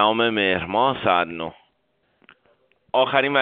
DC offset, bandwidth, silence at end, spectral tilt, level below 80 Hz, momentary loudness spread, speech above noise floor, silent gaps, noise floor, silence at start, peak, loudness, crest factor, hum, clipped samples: under 0.1%; 4.7 kHz; 0 s; -1.5 dB/octave; -58 dBFS; 10 LU; 48 dB; none; -68 dBFS; 0 s; -2 dBFS; -21 LUFS; 20 dB; none; under 0.1%